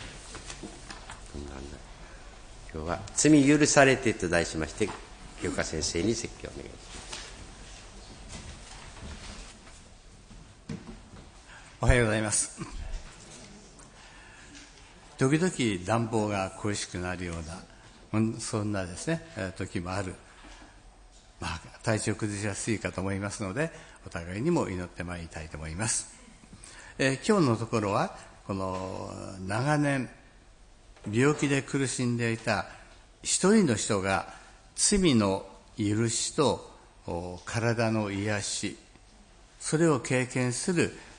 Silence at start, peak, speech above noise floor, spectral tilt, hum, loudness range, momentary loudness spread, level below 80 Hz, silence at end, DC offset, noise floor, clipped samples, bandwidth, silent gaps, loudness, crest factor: 0 s; -6 dBFS; 27 dB; -4.5 dB/octave; none; 11 LU; 23 LU; -46 dBFS; 0 s; under 0.1%; -55 dBFS; under 0.1%; 10.5 kHz; none; -28 LUFS; 24 dB